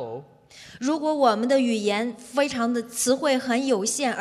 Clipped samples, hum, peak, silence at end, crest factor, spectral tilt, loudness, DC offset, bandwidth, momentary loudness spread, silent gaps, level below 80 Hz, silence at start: under 0.1%; none; -6 dBFS; 0 s; 18 dB; -3 dB/octave; -23 LUFS; under 0.1%; 14.5 kHz; 6 LU; none; -68 dBFS; 0 s